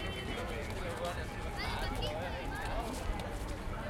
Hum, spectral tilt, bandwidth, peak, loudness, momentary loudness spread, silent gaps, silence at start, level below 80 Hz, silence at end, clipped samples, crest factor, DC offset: none; -5 dB/octave; 16.5 kHz; -24 dBFS; -39 LUFS; 4 LU; none; 0 s; -42 dBFS; 0 s; under 0.1%; 14 dB; under 0.1%